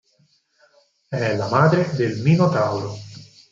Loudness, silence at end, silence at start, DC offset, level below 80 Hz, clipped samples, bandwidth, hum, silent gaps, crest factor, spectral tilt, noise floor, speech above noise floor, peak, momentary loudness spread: -20 LUFS; 0.25 s; 1.1 s; under 0.1%; -60 dBFS; under 0.1%; 7.6 kHz; none; none; 18 dB; -7.5 dB/octave; -62 dBFS; 43 dB; -2 dBFS; 15 LU